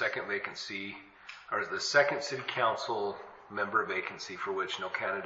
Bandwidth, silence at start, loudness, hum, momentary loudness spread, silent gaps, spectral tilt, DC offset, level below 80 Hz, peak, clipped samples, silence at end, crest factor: 7.6 kHz; 0 s; -32 LUFS; none; 15 LU; none; -0.5 dB/octave; under 0.1%; -76 dBFS; -12 dBFS; under 0.1%; 0 s; 22 dB